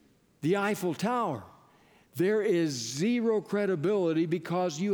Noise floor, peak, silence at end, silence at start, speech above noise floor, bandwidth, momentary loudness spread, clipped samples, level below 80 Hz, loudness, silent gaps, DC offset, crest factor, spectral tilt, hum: -61 dBFS; -16 dBFS; 0 s; 0.4 s; 33 dB; over 20 kHz; 4 LU; under 0.1%; -76 dBFS; -29 LUFS; none; under 0.1%; 14 dB; -5.5 dB/octave; none